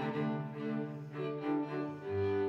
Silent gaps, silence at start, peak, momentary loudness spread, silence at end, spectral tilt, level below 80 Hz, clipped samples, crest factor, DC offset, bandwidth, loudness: none; 0 s; -24 dBFS; 4 LU; 0 s; -9 dB/octave; -80 dBFS; under 0.1%; 12 dB; under 0.1%; 6.8 kHz; -38 LUFS